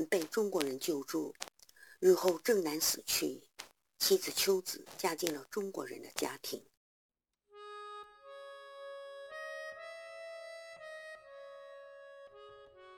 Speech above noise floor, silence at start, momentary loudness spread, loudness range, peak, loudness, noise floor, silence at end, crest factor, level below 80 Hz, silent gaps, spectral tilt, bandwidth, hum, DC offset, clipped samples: 28 dB; 0 s; 22 LU; 16 LU; -12 dBFS; -34 LUFS; -62 dBFS; 0 s; 24 dB; -78 dBFS; 6.77-7.09 s; -2.5 dB/octave; 19 kHz; none; under 0.1%; under 0.1%